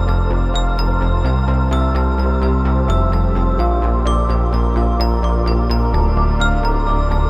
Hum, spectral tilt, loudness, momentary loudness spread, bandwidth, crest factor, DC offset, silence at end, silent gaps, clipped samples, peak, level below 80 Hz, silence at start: none; -7.5 dB/octave; -17 LUFS; 2 LU; 8.6 kHz; 10 dB; under 0.1%; 0 s; none; under 0.1%; -4 dBFS; -16 dBFS; 0 s